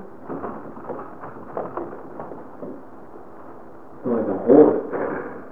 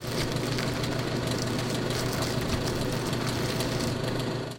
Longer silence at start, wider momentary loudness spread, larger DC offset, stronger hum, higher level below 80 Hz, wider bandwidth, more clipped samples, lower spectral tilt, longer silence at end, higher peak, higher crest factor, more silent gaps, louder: about the same, 0 s vs 0 s; first, 27 LU vs 1 LU; first, 0.9% vs under 0.1%; neither; second, -60 dBFS vs -44 dBFS; second, 3.5 kHz vs 17 kHz; neither; first, -11 dB/octave vs -5 dB/octave; about the same, 0 s vs 0 s; first, 0 dBFS vs -12 dBFS; first, 24 dB vs 16 dB; neither; first, -21 LUFS vs -29 LUFS